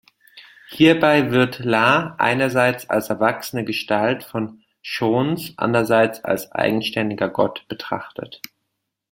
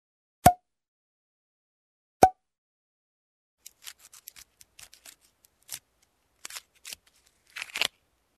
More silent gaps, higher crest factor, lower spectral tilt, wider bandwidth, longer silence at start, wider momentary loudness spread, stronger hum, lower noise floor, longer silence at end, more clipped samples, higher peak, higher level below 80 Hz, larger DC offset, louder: second, none vs 0.88-2.20 s, 2.58-3.58 s; second, 18 dB vs 32 dB; first, -5.5 dB/octave vs -3.5 dB/octave; first, 17 kHz vs 14 kHz; about the same, 0.35 s vs 0.45 s; second, 15 LU vs 25 LU; neither; first, -77 dBFS vs -71 dBFS; first, 0.75 s vs 0.5 s; neither; about the same, -2 dBFS vs -2 dBFS; about the same, -58 dBFS vs -54 dBFS; neither; first, -19 LUFS vs -25 LUFS